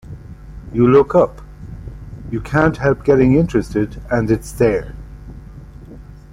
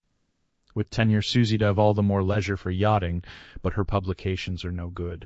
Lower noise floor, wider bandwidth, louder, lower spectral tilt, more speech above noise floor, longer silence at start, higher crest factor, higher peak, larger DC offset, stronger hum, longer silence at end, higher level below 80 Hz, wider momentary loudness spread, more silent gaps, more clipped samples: second, -37 dBFS vs -72 dBFS; first, 15.5 kHz vs 8 kHz; first, -16 LUFS vs -25 LUFS; about the same, -8 dB/octave vs -7 dB/octave; second, 22 dB vs 48 dB; second, 0.05 s vs 0.75 s; about the same, 16 dB vs 18 dB; first, -2 dBFS vs -6 dBFS; neither; neither; first, 0.2 s vs 0 s; first, -34 dBFS vs -44 dBFS; first, 24 LU vs 11 LU; neither; neither